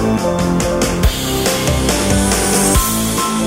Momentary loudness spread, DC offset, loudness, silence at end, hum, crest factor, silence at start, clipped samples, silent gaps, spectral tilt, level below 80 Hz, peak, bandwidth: 4 LU; under 0.1%; -14 LUFS; 0 s; none; 14 dB; 0 s; under 0.1%; none; -4 dB/octave; -22 dBFS; 0 dBFS; 16.5 kHz